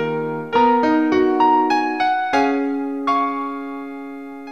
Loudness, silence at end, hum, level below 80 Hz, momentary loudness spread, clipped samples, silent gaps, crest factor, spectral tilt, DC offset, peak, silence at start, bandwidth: -18 LUFS; 0 s; none; -58 dBFS; 15 LU; under 0.1%; none; 14 dB; -5.5 dB/octave; 0.4%; -4 dBFS; 0 s; 8.2 kHz